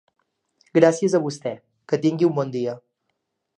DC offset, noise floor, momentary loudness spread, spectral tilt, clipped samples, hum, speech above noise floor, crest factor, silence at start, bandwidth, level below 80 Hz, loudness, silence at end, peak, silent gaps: under 0.1%; -76 dBFS; 15 LU; -6.5 dB/octave; under 0.1%; none; 56 dB; 22 dB; 0.75 s; 10 kHz; -74 dBFS; -21 LUFS; 0.8 s; -2 dBFS; none